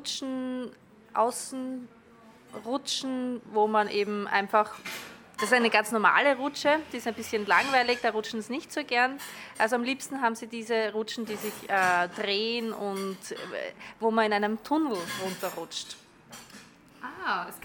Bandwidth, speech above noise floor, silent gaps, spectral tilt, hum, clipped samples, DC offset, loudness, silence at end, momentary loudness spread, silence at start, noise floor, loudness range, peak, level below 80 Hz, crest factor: 19 kHz; 26 dB; none; -3 dB/octave; none; under 0.1%; under 0.1%; -28 LUFS; 0.05 s; 16 LU; 0 s; -54 dBFS; 6 LU; -8 dBFS; -72 dBFS; 22 dB